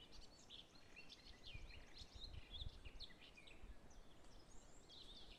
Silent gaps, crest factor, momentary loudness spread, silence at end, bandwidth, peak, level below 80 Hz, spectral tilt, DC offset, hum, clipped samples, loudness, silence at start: none; 20 dB; 11 LU; 0 s; 12.5 kHz; -38 dBFS; -64 dBFS; -3.5 dB/octave; under 0.1%; none; under 0.1%; -60 LUFS; 0 s